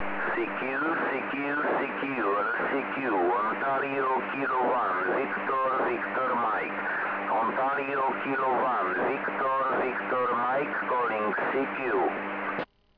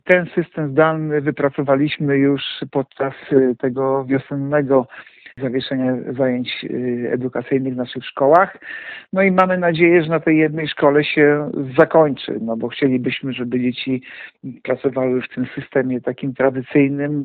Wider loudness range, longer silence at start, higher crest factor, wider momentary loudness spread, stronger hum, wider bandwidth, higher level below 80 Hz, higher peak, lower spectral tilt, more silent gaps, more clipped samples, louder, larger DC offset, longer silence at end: second, 1 LU vs 6 LU; about the same, 0 s vs 0.05 s; second, 10 dB vs 18 dB; second, 3 LU vs 10 LU; neither; first, 5.4 kHz vs 4.6 kHz; second, -70 dBFS vs -60 dBFS; second, -18 dBFS vs 0 dBFS; about the same, -8 dB/octave vs -9 dB/octave; neither; neither; second, -28 LUFS vs -18 LUFS; neither; first, 0.35 s vs 0 s